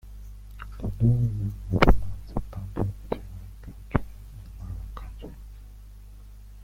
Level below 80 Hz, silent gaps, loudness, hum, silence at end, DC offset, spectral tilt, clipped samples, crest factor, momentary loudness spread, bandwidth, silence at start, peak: -34 dBFS; none; -28 LUFS; 50 Hz at -40 dBFS; 0 s; under 0.1%; -8 dB/octave; under 0.1%; 26 dB; 25 LU; 15.5 kHz; 0.05 s; -2 dBFS